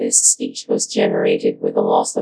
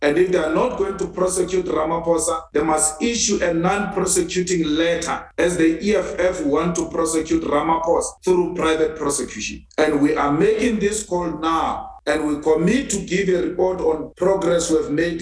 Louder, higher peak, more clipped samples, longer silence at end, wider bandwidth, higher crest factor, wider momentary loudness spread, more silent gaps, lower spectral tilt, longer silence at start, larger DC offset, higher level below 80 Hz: first, -17 LUFS vs -20 LUFS; first, 0 dBFS vs -4 dBFS; neither; about the same, 0 s vs 0 s; about the same, 11 kHz vs 11 kHz; about the same, 18 dB vs 14 dB; first, 8 LU vs 5 LU; neither; second, -2.5 dB/octave vs -4 dB/octave; about the same, 0 s vs 0 s; neither; second, -82 dBFS vs -42 dBFS